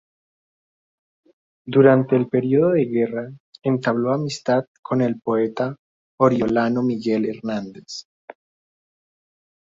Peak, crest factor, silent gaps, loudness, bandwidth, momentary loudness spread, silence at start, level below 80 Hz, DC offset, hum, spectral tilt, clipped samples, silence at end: -2 dBFS; 20 dB; 3.40-3.53 s, 4.67-4.83 s, 5.79-6.18 s; -20 LUFS; 7.8 kHz; 13 LU; 1.65 s; -62 dBFS; under 0.1%; none; -7.5 dB/octave; under 0.1%; 1.6 s